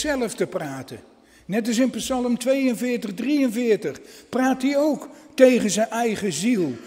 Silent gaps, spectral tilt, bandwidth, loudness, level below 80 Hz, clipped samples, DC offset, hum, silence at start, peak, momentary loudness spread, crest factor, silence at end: none; -4.5 dB/octave; 16 kHz; -22 LUFS; -56 dBFS; under 0.1%; under 0.1%; none; 0 s; -2 dBFS; 14 LU; 22 dB; 0 s